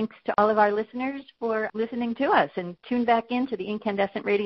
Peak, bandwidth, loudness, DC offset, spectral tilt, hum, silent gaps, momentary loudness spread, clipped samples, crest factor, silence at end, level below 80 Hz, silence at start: -4 dBFS; 6 kHz; -26 LUFS; under 0.1%; -3.5 dB/octave; none; none; 8 LU; under 0.1%; 20 dB; 0 s; -66 dBFS; 0 s